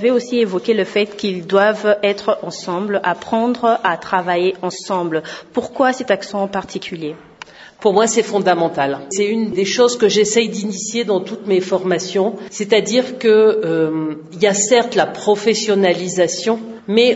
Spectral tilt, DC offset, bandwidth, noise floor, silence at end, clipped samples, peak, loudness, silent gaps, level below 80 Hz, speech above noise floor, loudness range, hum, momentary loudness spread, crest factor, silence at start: -3.5 dB/octave; under 0.1%; 8 kHz; -39 dBFS; 0 s; under 0.1%; 0 dBFS; -17 LUFS; none; -62 dBFS; 23 dB; 4 LU; none; 10 LU; 16 dB; 0 s